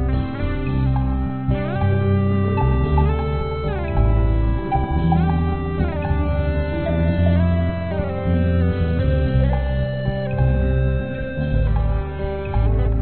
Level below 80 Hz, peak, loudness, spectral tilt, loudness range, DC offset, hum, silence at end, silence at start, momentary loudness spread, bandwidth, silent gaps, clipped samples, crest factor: -24 dBFS; -4 dBFS; -21 LUFS; -8 dB/octave; 1 LU; 1%; none; 0 s; 0 s; 5 LU; 4.4 kHz; none; under 0.1%; 14 dB